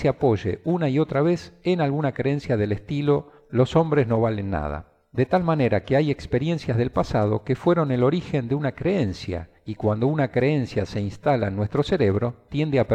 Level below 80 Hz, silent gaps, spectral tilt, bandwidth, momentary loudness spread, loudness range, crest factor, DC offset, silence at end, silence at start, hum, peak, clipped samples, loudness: -46 dBFS; none; -8 dB/octave; 8.8 kHz; 6 LU; 2 LU; 16 dB; under 0.1%; 0 s; 0 s; none; -6 dBFS; under 0.1%; -23 LUFS